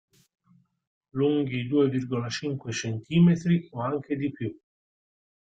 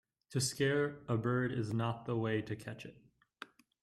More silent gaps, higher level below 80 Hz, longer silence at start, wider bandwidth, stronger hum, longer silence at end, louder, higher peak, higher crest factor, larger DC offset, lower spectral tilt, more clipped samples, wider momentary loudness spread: neither; first, -64 dBFS vs -70 dBFS; first, 1.15 s vs 0.3 s; second, 7.8 kHz vs 14.5 kHz; neither; first, 1 s vs 0.4 s; first, -27 LUFS vs -36 LUFS; first, -10 dBFS vs -20 dBFS; about the same, 18 dB vs 16 dB; neither; first, -7 dB/octave vs -5.5 dB/octave; neither; second, 10 LU vs 20 LU